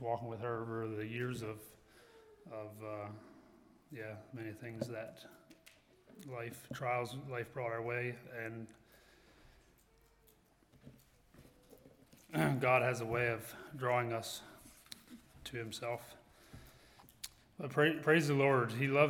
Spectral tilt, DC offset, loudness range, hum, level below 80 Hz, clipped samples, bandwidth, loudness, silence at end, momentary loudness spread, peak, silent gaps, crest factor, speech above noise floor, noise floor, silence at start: -6 dB/octave; under 0.1%; 13 LU; none; -70 dBFS; under 0.1%; 18 kHz; -38 LUFS; 0 s; 24 LU; -16 dBFS; none; 24 dB; 32 dB; -69 dBFS; 0 s